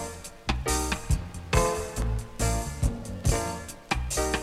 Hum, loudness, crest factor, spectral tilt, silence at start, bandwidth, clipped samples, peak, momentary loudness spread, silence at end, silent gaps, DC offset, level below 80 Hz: none; -29 LUFS; 22 dB; -4 dB/octave; 0 s; 15.5 kHz; under 0.1%; -6 dBFS; 6 LU; 0 s; none; under 0.1%; -32 dBFS